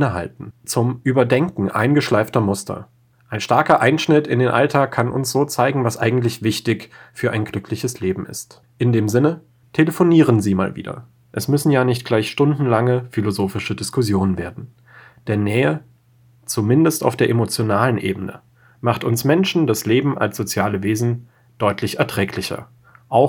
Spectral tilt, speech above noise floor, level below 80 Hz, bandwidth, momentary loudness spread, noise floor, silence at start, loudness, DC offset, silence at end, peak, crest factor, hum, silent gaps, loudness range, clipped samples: -6 dB/octave; 35 dB; -56 dBFS; over 20 kHz; 13 LU; -53 dBFS; 0 s; -19 LUFS; under 0.1%; 0 s; 0 dBFS; 18 dB; none; none; 4 LU; under 0.1%